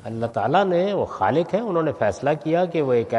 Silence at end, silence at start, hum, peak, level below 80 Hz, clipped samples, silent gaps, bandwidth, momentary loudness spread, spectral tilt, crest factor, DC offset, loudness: 0 s; 0.05 s; none; -6 dBFS; -60 dBFS; under 0.1%; none; 11 kHz; 4 LU; -7 dB/octave; 16 dB; under 0.1%; -22 LUFS